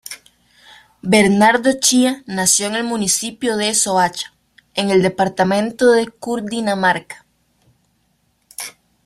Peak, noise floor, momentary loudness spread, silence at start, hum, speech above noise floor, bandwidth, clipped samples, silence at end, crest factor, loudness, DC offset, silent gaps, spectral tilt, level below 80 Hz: 0 dBFS; -63 dBFS; 17 LU; 0.1 s; none; 47 dB; 14.5 kHz; under 0.1%; 0.35 s; 18 dB; -16 LUFS; under 0.1%; none; -3 dB/octave; -56 dBFS